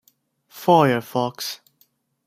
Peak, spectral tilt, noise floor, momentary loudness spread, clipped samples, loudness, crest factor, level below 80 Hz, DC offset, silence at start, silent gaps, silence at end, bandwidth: -2 dBFS; -5.5 dB/octave; -63 dBFS; 14 LU; under 0.1%; -20 LUFS; 20 dB; -66 dBFS; under 0.1%; 0.55 s; none; 0.7 s; 16 kHz